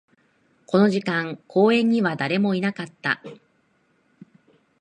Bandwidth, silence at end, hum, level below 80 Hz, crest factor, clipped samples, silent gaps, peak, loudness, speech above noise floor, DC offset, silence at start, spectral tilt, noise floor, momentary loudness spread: 9.6 kHz; 1.45 s; none; -72 dBFS; 18 dB; under 0.1%; none; -4 dBFS; -22 LUFS; 44 dB; under 0.1%; 0.7 s; -7 dB/octave; -65 dBFS; 10 LU